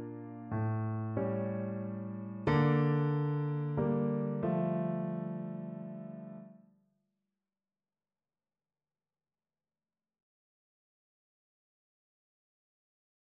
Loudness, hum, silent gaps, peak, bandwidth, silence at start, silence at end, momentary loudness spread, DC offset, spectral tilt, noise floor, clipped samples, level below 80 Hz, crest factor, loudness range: -34 LUFS; none; none; -18 dBFS; 5.2 kHz; 0 s; 6.8 s; 15 LU; under 0.1%; -8.5 dB/octave; under -90 dBFS; under 0.1%; -66 dBFS; 20 dB; 16 LU